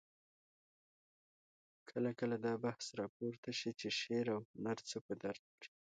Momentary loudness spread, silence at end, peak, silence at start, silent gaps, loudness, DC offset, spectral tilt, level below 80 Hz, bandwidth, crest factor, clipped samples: 8 LU; 0.25 s; -28 dBFS; 1.85 s; 3.09-3.20 s, 3.38-3.43 s, 4.45-4.54 s, 5.01-5.09 s, 5.39-5.58 s; -42 LUFS; under 0.1%; -4.5 dB/octave; -84 dBFS; 9 kHz; 18 dB; under 0.1%